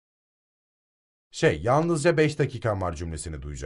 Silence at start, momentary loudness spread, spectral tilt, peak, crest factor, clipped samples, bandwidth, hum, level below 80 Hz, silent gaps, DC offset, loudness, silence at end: 1.35 s; 13 LU; -6 dB/octave; -6 dBFS; 20 dB; under 0.1%; 11.5 kHz; none; -46 dBFS; none; under 0.1%; -25 LUFS; 0 s